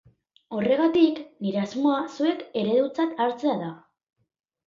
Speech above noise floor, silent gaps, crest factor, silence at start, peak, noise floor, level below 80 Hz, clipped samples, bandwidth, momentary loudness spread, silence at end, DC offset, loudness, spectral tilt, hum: 21 dB; none; 18 dB; 0.5 s; -8 dBFS; -45 dBFS; -70 dBFS; under 0.1%; 7.4 kHz; 10 LU; 0.9 s; under 0.1%; -25 LUFS; -6.5 dB/octave; none